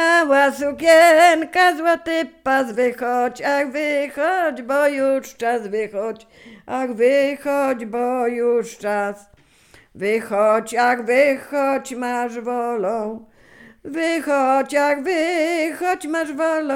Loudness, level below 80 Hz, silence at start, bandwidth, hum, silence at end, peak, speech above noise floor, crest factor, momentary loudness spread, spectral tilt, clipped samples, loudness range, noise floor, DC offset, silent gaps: -19 LUFS; -62 dBFS; 0 s; 16.5 kHz; none; 0 s; -2 dBFS; 33 dB; 18 dB; 10 LU; -3.5 dB/octave; under 0.1%; 6 LU; -52 dBFS; under 0.1%; none